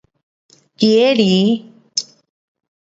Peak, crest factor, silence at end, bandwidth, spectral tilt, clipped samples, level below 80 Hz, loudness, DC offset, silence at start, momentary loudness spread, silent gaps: 0 dBFS; 18 dB; 0.95 s; 8 kHz; -5 dB/octave; under 0.1%; -64 dBFS; -15 LUFS; under 0.1%; 0.8 s; 11 LU; none